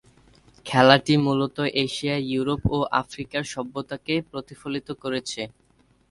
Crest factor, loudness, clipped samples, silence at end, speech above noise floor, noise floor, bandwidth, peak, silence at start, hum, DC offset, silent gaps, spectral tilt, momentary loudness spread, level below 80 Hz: 24 dB; -24 LUFS; under 0.1%; 0.6 s; 38 dB; -61 dBFS; 11.5 kHz; 0 dBFS; 0.65 s; none; under 0.1%; none; -5.5 dB/octave; 15 LU; -48 dBFS